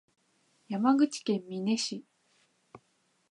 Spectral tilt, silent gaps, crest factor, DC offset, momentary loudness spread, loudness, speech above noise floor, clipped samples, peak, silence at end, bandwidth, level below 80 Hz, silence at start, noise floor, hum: -4.5 dB/octave; none; 20 dB; under 0.1%; 12 LU; -30 LUFS; 44 dB; under 0.1%; -12 dBFS; 0.55 s; 10.5 kHz; -84 dBFS; 0.7 s; -73 dBFS; none